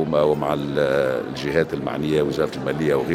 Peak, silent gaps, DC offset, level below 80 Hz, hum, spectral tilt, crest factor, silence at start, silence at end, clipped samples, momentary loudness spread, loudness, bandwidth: -4 dBFS; none; under 0.1%; -48 dBFS; none; -6.5 dB/octave; 16 dB; 0 s; 0 s; under 0.1%; 5 LU; -22 LUFS; 15.5 kHz